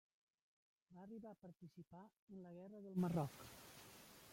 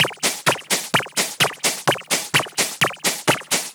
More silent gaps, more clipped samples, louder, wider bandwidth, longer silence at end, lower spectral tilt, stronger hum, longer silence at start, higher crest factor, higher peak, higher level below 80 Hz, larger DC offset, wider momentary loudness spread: first, 2.19-2.28 s vs none; neither; second, -50 LUFS vs -20 LUFS; second, 16.5 kHz vs over 20 kHz; about the same, 0 s vs 0 s; first, -7 dB/octave vs -1.5 dB/octave; neither; first, 0.9 s vs 0 s; about the same, 20 dB vs 20 dB; second, -30 dBFS vs -2 dBFS; second, -80 dBFS vs -72 dBFS; neither; first, 19 LU vs 3 LU